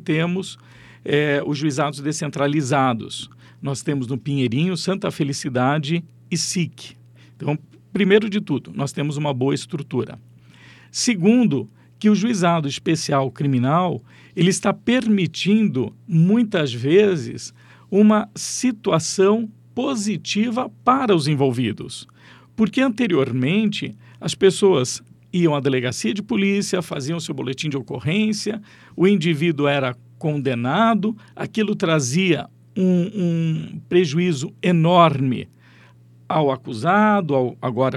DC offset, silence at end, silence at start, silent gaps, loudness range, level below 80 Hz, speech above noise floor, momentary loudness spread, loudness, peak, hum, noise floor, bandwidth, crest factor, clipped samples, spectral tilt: under 0.1%; 0 s; 0.05 s; none; 4 LU; -64 dBFS; 29 dB; 12 LU; -20 LUFS; -2 dBFS; none; -49 dBFS; 13 kHz; 20 dB; under 0.1%; -5.5 dB/octave